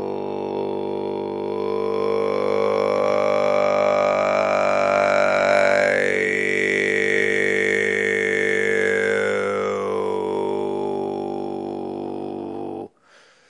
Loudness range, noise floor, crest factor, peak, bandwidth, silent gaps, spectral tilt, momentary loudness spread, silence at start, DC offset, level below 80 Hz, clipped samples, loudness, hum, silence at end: 7 LU; -54 dBFS; 18 dB; -4 dBFS; 11 kHz; none; -4.5 dB/octave; 11 LU; 0 s; under 0.1%; -72 dBFS; under 0.1%; -21 LUFS; 50 Hz at -50 dBFS; 0.6 s